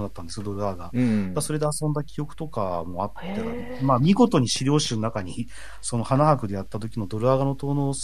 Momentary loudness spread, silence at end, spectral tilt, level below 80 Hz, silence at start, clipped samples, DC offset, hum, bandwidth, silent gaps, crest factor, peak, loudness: 13 LU; 0 s; -6 dB/octave; -48 dBFS; 0 s; under 0.1%; 2%; none; 13.5 kHz; none; 20 dB; -4 dBFS; -25 LUFS